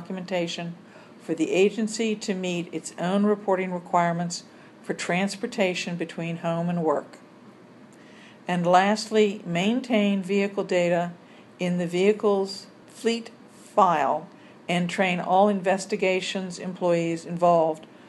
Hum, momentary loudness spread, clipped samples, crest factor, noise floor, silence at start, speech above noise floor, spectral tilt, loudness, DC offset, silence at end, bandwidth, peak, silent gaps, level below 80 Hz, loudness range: none; 11 LU; under 0.1%; 20 dB; -49 dBFS; 0 s; 25 dB; -5.5 dB/octave; -25 LUFS; under 0.1%; 0 s; 12 kHz; -4 dBFS; none; -76 dBFS; 4 LU